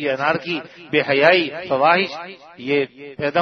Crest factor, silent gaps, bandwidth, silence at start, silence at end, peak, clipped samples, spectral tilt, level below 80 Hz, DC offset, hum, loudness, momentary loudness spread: 20 dB; none; 6.4 kHz; 0 s; 0 s; 0 dBFS; under 0.1%; -6 dB/octave; -64 dBFS; under 0.1%; none; -19 LUFS; 14 LU